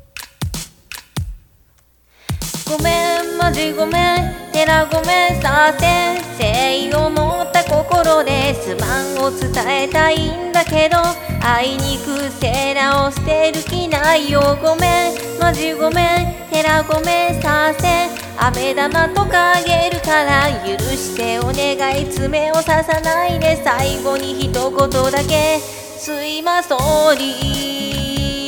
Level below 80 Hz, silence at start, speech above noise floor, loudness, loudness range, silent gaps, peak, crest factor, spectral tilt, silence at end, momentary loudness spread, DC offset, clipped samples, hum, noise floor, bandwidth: -32 dBFS; 0.15 s; 38 dB; -16 LUFS; 3 LU; none; 0 dBFS; 16 dB; -4 dB/octave; 0 s; 7 LU; under 0.1%; under 0.1%; none; -54 dBFS; 19 kHz